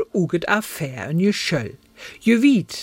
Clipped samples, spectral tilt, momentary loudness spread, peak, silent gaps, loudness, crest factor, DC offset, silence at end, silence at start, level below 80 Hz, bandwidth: under 0.1%; -5.5 dB/octave; 16 LU; -2 dBFS; none; -20 LUFS; 18 dB; under 0.1%; 0 s; 0 s; -56 dBFS; 16.5 kHz